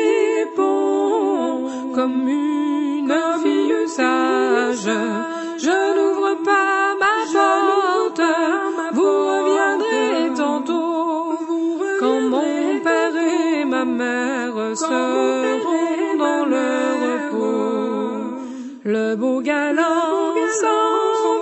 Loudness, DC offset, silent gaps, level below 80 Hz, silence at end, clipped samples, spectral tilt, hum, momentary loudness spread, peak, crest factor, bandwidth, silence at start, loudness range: -19 LUFS; under 0.1%; none; -72 dBFS; 0 s; under 0.1%; -3.5 dB/octave; none; 5 LU; -4 dBFS; 14 dB; 8.4 kHz; 0 s; 3 LU